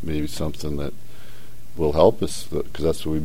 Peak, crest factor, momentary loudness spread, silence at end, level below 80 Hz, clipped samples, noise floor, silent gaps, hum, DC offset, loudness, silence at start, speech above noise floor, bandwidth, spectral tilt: -2 dBFS; 22 dB; 13 LU; 0 s; -38 dBFS; under 0.1%; -45 dBFS; none; none; 6%; -24 LUFS; 0 s; 22 dB; 16.5 kHz; -6 dB/octave